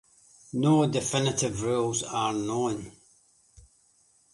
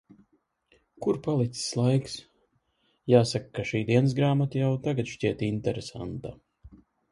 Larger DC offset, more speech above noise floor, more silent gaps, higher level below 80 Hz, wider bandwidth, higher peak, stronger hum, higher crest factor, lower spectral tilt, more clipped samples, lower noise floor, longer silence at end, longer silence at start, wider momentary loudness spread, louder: neither; second, 38 dB vs 45 dB; neither; about the same, -60 dBFS vs -58 dBFS; about the same, 11.5 kHz vs 11.5 kHz; second, -12 dBFS vs -6 dBFS; neither; about the same, 18 dB vs 22 dB; second, -5 dB/octave vs -6.5 dB/octave; neither; second, -64 dBFS vs -71 dBFS; first, 1.45 s vs 0.35 s; second, 0.55 s vs 1 s; second, 10 LU vs 14 LU; about the same, -27 LUFS vs -27 LUFS